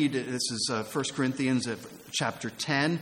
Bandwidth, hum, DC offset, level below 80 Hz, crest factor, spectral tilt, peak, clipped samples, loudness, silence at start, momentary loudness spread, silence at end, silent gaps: 17 kHz; none; under 0.1%; -68 dBFS; 18 dB; -4 dB/octave; -12 dBFS; under 0.1%; -30 LUFS; 0 s; 7 LU; 0 s; none